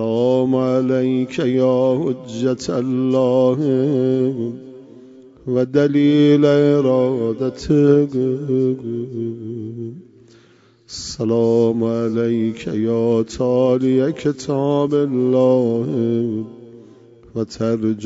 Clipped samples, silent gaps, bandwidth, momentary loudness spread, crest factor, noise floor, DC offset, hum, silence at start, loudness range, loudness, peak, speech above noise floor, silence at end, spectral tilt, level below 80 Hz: under 0.1%; none; 7.8 kHz; 12 LU; 16 dB; -52 dBFS; under 0.1%; none; 0 s; 5 LU; -18 LUFS; -2 dBFS; 35 dB; 0 s; -7.5 dB/octave; -52 dBFS